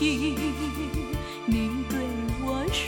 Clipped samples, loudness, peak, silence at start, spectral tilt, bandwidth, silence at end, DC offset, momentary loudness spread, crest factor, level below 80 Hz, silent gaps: under 0.1%; -29 LUFS; -12 dBFS; 0 s; -5 dB/octave; 17.5 kHz; 0 s; under 0.1%; 5 LU; 16 dB; -36 dBFS; none